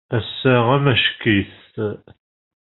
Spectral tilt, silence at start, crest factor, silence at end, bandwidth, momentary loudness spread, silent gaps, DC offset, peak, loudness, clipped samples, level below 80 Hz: -4 dB/octave; 0.1 s; 18 dB; 0.75 s; 4.2 kHz; 12 LU; none; under 0.1%; -2 dBFS; -18 LUFS; under 0.1%; -54 dBFS